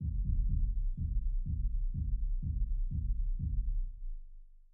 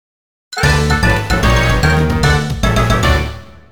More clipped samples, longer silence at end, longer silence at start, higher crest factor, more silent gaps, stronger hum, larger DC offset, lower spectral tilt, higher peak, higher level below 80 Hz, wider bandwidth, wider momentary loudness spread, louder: neither; first, 0.2 s vs 0 s; second, 0 s vs 0.5 s; about the same, 12 dB vs 14 dB; neither; neither; second, under 0.1% vs 3%; first, -13 dB/octave vs -5 dB/octave; second, -22 dBFS vs 0 dBFS; second, -34 dBFS vs -20 dBFS; second, 0.4 kHz vs over 20 kHz; about the same, 7 LU vs 5 LU; second, -38 LUFS vs -13 LUFS